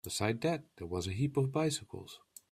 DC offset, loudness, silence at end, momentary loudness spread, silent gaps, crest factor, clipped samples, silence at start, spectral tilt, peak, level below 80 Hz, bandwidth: under 0.1%; -35 LUFS; 0.35 s; 16 LU; none; 20 dB; under 0.1%; 0.05 s; -5 dB/octave; -16 dBFS; -66 dBFS; 15.5 kHz